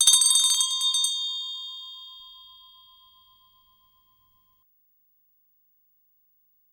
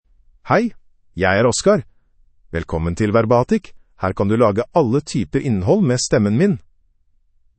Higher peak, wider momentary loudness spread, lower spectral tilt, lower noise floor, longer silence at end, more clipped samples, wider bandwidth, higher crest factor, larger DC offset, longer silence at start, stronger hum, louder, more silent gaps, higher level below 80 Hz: second, -6 dBFS vs -2 dBFS; first, 26 LU vs 10 LU; second, 6 dB/octave vs -6 dB/octave; first, -66 dBFS vs -58 dBFS; first, 4.4 s vs 1 s; neither; first, 19 kHz vs 8.8 kHz; about the same, 22 dB vs 18 dB; neither; second, 0 s vs 0.45 s; first, 60 Hz at -95 dBFS vs none; second, -21 LUFS vs -18 LUFS; neither; second, -78 dBFS vs -44 dBFS